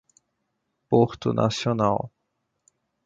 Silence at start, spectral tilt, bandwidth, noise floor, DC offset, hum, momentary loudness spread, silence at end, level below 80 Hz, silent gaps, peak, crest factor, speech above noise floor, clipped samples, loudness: 0.9 s; -6.5 dB/octave; 7.8 kHz; -77 dBFS; under 0.1%; none; 6 LU; 1 s; -56 dBFS; none; -4 dBFS; 22 dB; 55 dB; under 0.1%; -24 LUFS